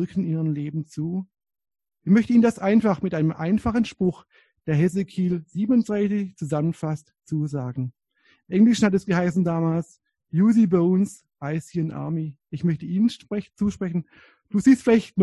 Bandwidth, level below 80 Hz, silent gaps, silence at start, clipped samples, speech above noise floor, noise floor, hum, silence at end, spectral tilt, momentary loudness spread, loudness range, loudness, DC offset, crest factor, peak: 11.5 kHz; -54 dBFS; none; 0 s; under 0.1%; 41 dB; -63 dBFS; none; 0 s; -7.5 dB/octave; 13 LU; 4 LU; -23 LUFS; under 0.1%; 16 dB; -6 dBFS